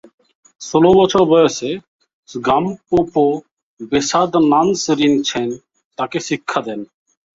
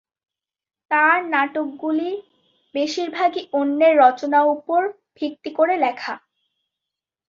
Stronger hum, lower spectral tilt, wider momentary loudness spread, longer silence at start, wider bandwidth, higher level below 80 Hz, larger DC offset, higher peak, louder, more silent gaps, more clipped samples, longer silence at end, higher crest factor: neither; first, -5 dB/octave vs -3.5 dB/octave; first, 17 LU vs 14 LU; second, 0.6 s vs 0.9 s; about the same, 7.8 kHz vs 7.4 kHz; first, -50 dBFS vs -74 dBFS; neither; about the same, -2 dBFS vs -2 dBFS; first, -16 LUFS vs -20 LUFS; first, 1.88-1.99 s, 2.13-2.23 s, 3.51-3.57 s, 3.63-3.77 s, 5.85-5.91 s vs none; neither; second, 0.5 s vs 1.1 s; about the same, 16 dB vs 18 dB